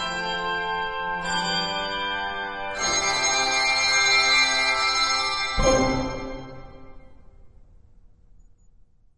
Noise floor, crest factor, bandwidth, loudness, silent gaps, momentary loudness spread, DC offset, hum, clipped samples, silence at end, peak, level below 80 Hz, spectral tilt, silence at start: -54 dBFS; 18 dB; 10.5 kHz; -22 LUFS; none; 12 LU; under 0.1%; none; under 0.1%; 0.8 s; -8 dBFS; -40 dBFS; -1.5 dB/octave; 0 s